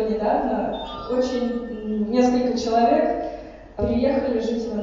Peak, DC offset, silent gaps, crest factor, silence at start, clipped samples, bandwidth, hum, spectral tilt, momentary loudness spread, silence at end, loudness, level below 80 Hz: -6 dBFS; under 0.1%; none; 16 dB; 0 s; under 0.1%; 7.6 kHz; none; -6 dB/octave; 10 LU; 0 s; -22 LUFS; -44 dBFS